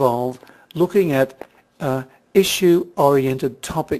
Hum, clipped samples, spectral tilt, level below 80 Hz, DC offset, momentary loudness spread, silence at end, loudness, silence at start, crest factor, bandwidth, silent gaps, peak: none; under 0.1%; -5.5 dB/octave; -52 dBFS; under 0.1%; 11 LU; 0 s; -19 LUFS; 0 s; 16 dB; 14 kHz; none; -2 dBFS